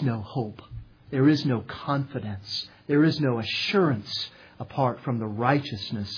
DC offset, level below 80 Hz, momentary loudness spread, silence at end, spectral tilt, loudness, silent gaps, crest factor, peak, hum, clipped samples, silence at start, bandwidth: under 0.1%; -58 dBFS; 14 LU; 0 s; -7 dB/octave; -26 LUFS; none; 20 dB; -6 dBFS; none; under 0.1%; 0 s; 5.4 kHz